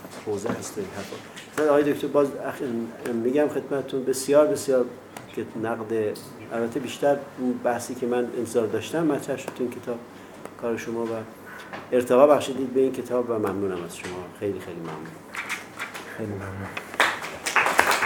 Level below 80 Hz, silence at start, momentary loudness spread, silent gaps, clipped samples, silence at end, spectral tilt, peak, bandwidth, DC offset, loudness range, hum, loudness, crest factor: -66 dBFS; 0 s; 15 LU; none; under 0.1%; 0 s; -4.5 dB/octave; 0 dBFS; 19.5 kHz; under 0.1%; 6 LU; none; -26 LUFS; 26 dB